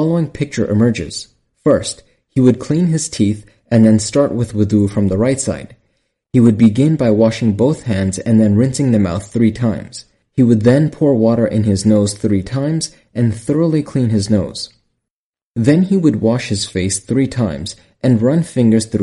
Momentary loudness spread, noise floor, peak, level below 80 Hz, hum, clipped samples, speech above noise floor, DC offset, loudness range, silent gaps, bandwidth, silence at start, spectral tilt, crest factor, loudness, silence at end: 11 LU; -86 dBFS; 0 dBFS; -44 dBFS; none; under 0.1%; 73 dB; under 0.1%; 3 LU; 15.11-15.33 s, 15.42-15.54 s; 11.5 kHz; 0 s; -6.5 dB/octave; 14 dB; -15 LUFS; 0 s